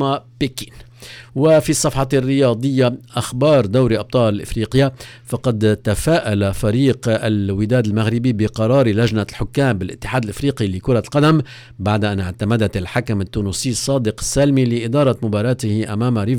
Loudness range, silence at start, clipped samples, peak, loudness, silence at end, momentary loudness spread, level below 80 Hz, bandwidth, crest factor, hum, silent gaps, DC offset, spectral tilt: 2 LU; 0 s; under 0.1%; -4 dBFS; -18 LUFS; 0 s; 8 LU; -38 dBFS; 18.5 kHz; 12 dB; none; none; under 0.1%; -6 dB/octave